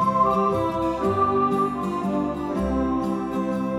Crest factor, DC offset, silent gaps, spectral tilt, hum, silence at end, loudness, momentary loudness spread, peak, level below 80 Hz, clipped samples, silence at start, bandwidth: 14 dB; under 0.1%; none; -8 dB/octave; none; 0 s; -23 LUFS; 6 LU; -8 dBFS; -42 dBFS; under 0.1%; 0 s; 14 kHz